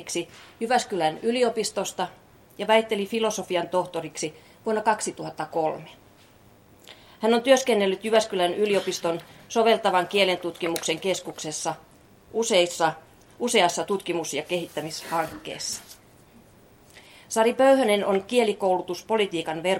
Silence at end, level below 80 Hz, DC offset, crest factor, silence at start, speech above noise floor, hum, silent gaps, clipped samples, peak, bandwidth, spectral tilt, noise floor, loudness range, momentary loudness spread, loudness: 0 s; -66 dBFS; under 0.1%; 20 dB; 0 s; 30 dB; none; none; under 0.1%; -6 dBFS; 17 kHz; -3 dB/octave; -54 dBFS; 6 LU; 12 LU; -25 LUFS